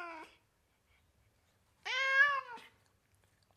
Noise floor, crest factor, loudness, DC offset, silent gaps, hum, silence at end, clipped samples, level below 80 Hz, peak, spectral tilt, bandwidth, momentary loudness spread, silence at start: -75 dBFS; 22 dB; -31 LUFS; under 0.1%; none; none; 0.95 s; under 0.1%; -80 dBFS; -16 dBFS; 0 dB/octave; 13 kHz; 24 LU; 0 s